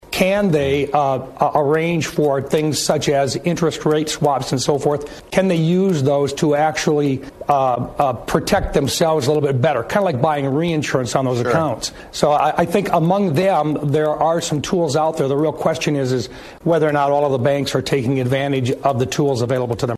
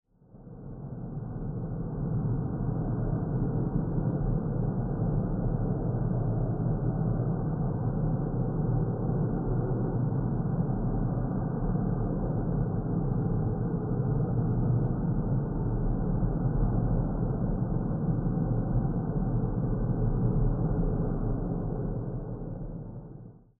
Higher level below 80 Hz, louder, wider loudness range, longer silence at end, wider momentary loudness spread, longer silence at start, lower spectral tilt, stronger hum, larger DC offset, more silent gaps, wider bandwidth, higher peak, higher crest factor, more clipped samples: second, -42 dBFS vs -36 dBFS; first, -18 LUFS vs -30 LUFS; about the same, 1 LU vs 2 LU; second, 0 s vs 0.3 s; second, 4 LU vs 7 LU; second, 0.1 s vs 0.35 s; second, -5.5 dB/octave vs -14.5 dB/octave; neither; neither; neither; first, 13.5 kHz vs 1.8 kHz; first, 0 dBFS vs -14 dBFS; about the same, 18 dB vs 14 dB; neither